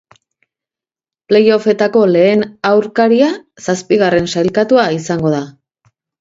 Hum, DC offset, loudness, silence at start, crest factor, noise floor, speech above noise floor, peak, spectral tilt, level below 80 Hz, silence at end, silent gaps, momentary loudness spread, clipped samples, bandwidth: none; under 0.1%; -13 LUFS; 1.3 s; 14 dB; -89 dBFS; 77 dB; 0 dBFS; -5.5 dB/octave; -52 dBFS; 0.7 s; none; 8 LU; under 0.1%; 7.8 kHz